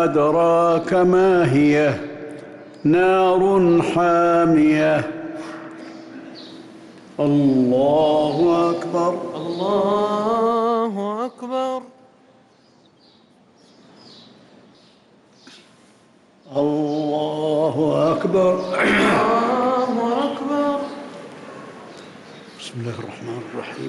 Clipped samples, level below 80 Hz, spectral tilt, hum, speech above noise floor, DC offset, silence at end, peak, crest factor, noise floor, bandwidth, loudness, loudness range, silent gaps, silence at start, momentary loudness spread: under 0.1%; -56 dBFS; -7 dB/octave; none; 36 dB; under 0.1%; 0 s; -8 dBFS; 12 dB; -54 dBFS; 12 kHz; -18 LUFS; 11 LU; none; 0 s; 22 LU